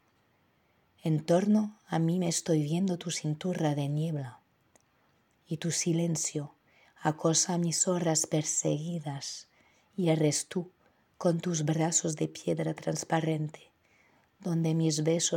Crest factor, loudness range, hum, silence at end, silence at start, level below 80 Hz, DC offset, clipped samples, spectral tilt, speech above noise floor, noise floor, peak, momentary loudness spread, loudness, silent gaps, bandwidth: 18 dB; 4 LU; none; 0 s; 1.05 s; -78 dBFS; under 0.1%; under 0.1%; -4.5 dB/octave; 40 dB; -70 dBFS; -12 dBFS; 12 LU; -30 LUFS; none; 16.5 kHz